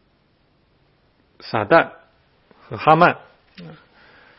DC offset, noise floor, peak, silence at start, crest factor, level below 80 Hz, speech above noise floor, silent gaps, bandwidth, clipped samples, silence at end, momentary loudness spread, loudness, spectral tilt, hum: under 0.1%; -61 dBFS; 0 dBFS; 1.45 s; 22 dB; -60 dBFS; 44 dB; none; 5.8 kHz; under 0.1%; 0.7 s; 27 LU; -17 LUFS; -8.5 dB/octave; none